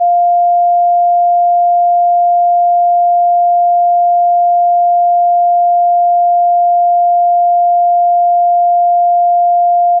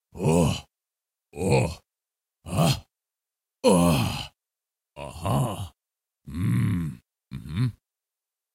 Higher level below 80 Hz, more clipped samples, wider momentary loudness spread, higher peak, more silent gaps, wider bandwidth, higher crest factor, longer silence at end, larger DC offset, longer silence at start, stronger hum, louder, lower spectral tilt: second, under -90 dBFS vs -46 dBFS; neither; second, 0 LU vs 20 LU; about the same, -6 dBFS vs -8 dBFS; neither; second, 0.8 kHz vs 16 kHz; second, 4 dB vs 20 dB; second, 0 s vs 0.8 s; neither; second, 0 s vs 0.15 s; neither; first, -10 LUFS vs -25 LUFS; second, -4 dB/octave vs -6 dB/octave